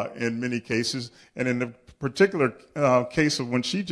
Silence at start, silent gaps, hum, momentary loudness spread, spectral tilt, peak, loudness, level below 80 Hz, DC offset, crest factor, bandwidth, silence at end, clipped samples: 0 s; none; none; 12 LU; -5 dB/octave; -6 dBFS; -25 LUFS; -58 dBFS; under 0.1%; 20 dB; 11 kHz; 0 s; under 0.1%